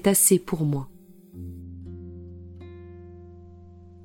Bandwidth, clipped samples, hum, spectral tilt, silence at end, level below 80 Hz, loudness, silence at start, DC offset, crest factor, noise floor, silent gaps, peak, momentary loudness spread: 17 kHz; under 0.1%; none; -4.5 dB/octave; 0.6 s; -54 dBFS; -21 LUFS; 0 s; under 0.1%; 22 dB; -47 dBFS; none; -4 dBFS; 27 LU